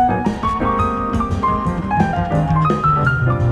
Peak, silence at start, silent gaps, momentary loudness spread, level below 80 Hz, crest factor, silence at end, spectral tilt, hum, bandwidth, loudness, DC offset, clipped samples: -4 dBFS; 0 s; none; 4 LU; -30 dBFS; 14 dB; 0 s; -8 dB/octave; none; 10 kHz; -17 LUFS; under 0.1%; under 0.1%